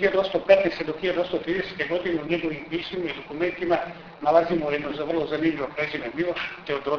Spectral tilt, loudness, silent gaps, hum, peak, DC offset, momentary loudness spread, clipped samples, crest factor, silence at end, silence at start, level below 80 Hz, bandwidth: -6.5 dB/octave; -25 LUFS; none; none; -4 dBFS; under 0.1%; 10 LU; under 0.1%; 22 dB; 0 s; 0 s; -56 dBFS; 5.4 kHz